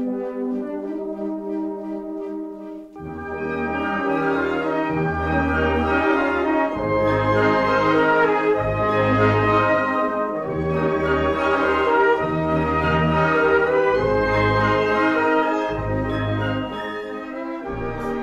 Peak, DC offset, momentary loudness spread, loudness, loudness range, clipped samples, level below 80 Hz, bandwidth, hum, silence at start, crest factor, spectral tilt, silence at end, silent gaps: -6 dBFS; under 0.1%; 12 LU; -21 LUFS; 7 LU; under 0.1%; -38 dBFS; 9 kHz; none; 0 s; 14 dB; -7.5 dB/octave; 0 s; none